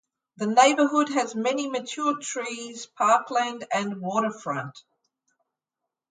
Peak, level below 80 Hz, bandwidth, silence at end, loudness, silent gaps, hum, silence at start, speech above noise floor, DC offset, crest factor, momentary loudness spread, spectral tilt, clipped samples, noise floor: -6 dBFS; -80 dBFS; 9.6 kHz; 1.3 s; -25 LUFS; none; none; 0.4 s; 62 dB; under 0.1%; 20 dB; 13 LU; -3.5 dB/octave; under 0.1%; -86 dBFS